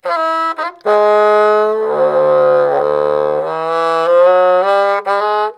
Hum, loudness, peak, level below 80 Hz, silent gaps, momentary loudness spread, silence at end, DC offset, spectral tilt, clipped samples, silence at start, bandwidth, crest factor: none; -13 LUFS; 0 dBFS; -58 dBFS; none; 7 LU; 0.05 s; under 0.1%; -5 dB/octave; under 0.1%; 0.05 s; 10.5 kHz; 12 dB